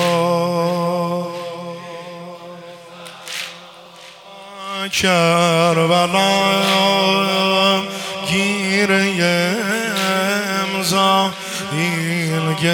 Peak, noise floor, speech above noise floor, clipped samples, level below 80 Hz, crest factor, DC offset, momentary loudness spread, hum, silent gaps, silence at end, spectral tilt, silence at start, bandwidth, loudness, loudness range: -2 dBFS; -40 dBFS; 24 dB; under 0.1%; -60 dBFS; 16 dB; under 0.1%; 20 LU; none; none; 0 s; -4 dB/octave; 0 s; 18 kHz; -17 LUFS; 13 LU